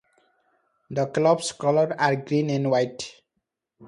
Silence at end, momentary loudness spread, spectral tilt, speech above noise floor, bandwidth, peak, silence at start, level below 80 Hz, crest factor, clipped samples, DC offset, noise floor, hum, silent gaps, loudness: 0 s; 10 LU; -5.5 dB/octave; 57 dB; 11 kHz; -6 dBFS; 0.9 s; -68 dBFS; 20 dB; under 0.1%; under 0.1%; -80 dBFS; none; none; -23 LUFS